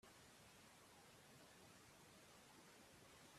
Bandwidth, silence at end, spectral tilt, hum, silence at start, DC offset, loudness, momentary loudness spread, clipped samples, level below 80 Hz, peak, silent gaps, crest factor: 15 kHz; 0 s; -3 dB/octave; none; 0 s; under 0.1%; -66 LUFS; 1 LU; under 0.1%; -86 dBFS; -54 dBFS; none; 14 dB